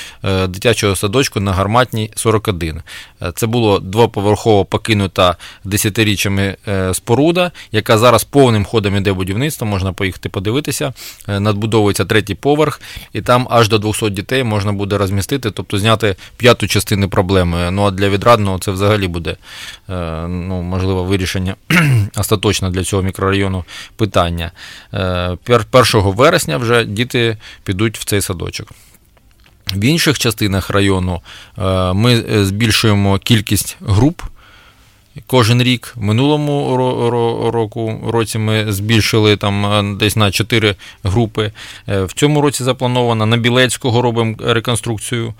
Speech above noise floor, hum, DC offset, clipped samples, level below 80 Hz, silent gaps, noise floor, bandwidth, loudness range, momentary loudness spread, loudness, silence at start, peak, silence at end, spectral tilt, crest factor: 34 dB; none; under 0.1%; under 0.1%; -38 dBFS; none; -48 dBFS; 17 kHz; 3 LU; 10 LU; -15 LUFS; 0 s; 0 dBFS; 0.05 s; -5 dB/octave; 14 dB